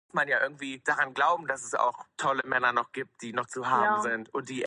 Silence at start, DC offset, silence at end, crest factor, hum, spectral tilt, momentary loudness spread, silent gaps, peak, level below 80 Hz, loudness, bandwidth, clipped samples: 0.15 s; under 0.1%; 0 s; 20 dB; none; -3 dB/octave; 9 LU; none; -10 dBFS; -76 dBFS; -28 LUFS; 11.5 kHz; under 0.1%